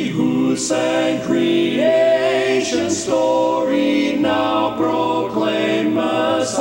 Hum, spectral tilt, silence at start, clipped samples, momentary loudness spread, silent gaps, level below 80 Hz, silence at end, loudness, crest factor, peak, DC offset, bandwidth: none; -4.5 dB/octave; 0 s; under 0.1%; 3 LU; none; -54 dBFS; 0 s; -17 LUFS; 12 dB; -4 dBFS; under 0.1%; 16 kHz